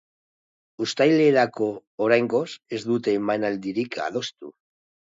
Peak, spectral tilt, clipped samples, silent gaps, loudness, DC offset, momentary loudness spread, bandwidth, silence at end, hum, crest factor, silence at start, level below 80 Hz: -6 dBFS; -5.5 dB/octave; under 0.1%; 1.87-1.98 s; -23 LUFS; under 0.1%; 13 LU; 7.8 kHz; 0.65 s; none; 18 dB; 0.8 s; -72 dBFS